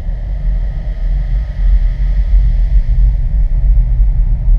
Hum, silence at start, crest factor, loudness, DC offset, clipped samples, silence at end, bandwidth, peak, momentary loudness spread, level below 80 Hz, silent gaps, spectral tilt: none; 0 s; 10 dB; -16 LUFS; under 0.1%; under 0.1%; 0 s; 2.3 kHz; -2 dBFS; 6 LU; -12 dBFS; none; -9.5 dB/octave